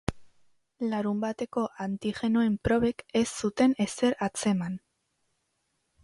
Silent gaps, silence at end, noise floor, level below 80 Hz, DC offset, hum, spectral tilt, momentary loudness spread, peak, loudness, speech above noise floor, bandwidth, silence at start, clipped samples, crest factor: none; 1.25 s; -77 dBFS; -52 dBFS; under 0.1%; none; -5.5 dB/octave; 7 LU; -10 dBFS; -28 LUFS; 49 dB; 11.5 kHz; 0.1 s; under 0.1%; 20 dB